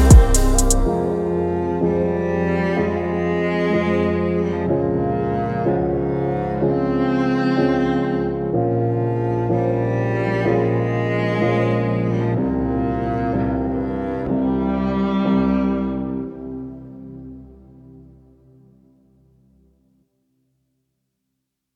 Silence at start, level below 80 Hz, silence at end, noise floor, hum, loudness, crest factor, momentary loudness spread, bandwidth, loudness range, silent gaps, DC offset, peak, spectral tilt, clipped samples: 0 s; -26 dBFS; 3.75 s; -77 dBFS; none; -20 LUFS; 20 dB; 5 LU; 16.5 kHz; 4 LU; none; under 0.1%; 0 dBFS; -6.5 dB/octave; under 0.1%